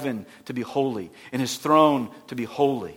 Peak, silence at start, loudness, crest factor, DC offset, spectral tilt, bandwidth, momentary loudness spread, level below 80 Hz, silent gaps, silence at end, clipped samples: -4 dBFS; 0 s; -24 LUFS; 20 dB; under 0.1%; -5.5 dB/octave; 17 kHz; 16 LU; -68 dBFS; none; 0 s; under 0.1%